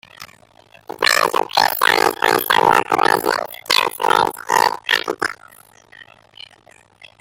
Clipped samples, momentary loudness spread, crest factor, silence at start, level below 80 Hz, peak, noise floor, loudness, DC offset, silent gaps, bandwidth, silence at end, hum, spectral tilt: under 0.1%; 8 LU; 20 dB; 0.2 s; -60 dBFS; 0 dBFS; -50 dBFS; -16 LUFS; under 0.1%; none; 17 kHz; 1.2 s; none; -1.5 dB/octave